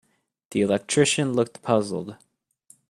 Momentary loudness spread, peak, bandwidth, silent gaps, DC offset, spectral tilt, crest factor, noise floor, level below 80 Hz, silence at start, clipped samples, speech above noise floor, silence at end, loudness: 11 LU; -4 dBFS; 13 kHz; none; under 0.1%; -4.5 dB/octave; 20 dB; -58 dBFS; -64 dBFS; 0.5 s; under 0.1%; 35 dB; 0.75 s; -23 LUFS